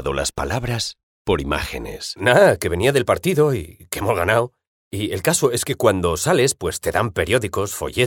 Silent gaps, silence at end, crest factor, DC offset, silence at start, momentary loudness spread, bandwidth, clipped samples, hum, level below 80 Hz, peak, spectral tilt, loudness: 1.03-1.25 s, 4.67-4.91 s; 0 s; 20 dB; under 0.1%; 0 s; 11 LU; 19 kHz; under 0.1%; none; -40 dBFS; 0 dBFS; -4 dB/octave; -20 LUFS